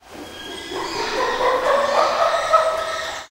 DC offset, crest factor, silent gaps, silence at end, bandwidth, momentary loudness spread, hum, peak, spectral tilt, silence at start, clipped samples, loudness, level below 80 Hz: under 0.1%; 18 dB; none; 0.05 s; 16 kHz; 14 LU; none; -2 dBFS; -2 dB/octave; 0.05 s; under 0.1%; -20 LUFS; -48 dBFS